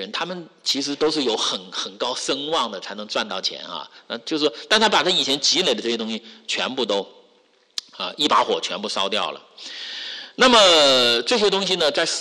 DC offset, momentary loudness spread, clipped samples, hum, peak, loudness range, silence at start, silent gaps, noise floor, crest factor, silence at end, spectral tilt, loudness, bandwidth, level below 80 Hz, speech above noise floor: under 0.1%; 17 LU; under 0.1%; none; -6 dBFS; 7 LU; 0 s; none; -59 dBFS; 16 dB; 0 s; -2 dB/octave; -20 LUFS; 12.5 kHz; -62 dBFS; 38 dB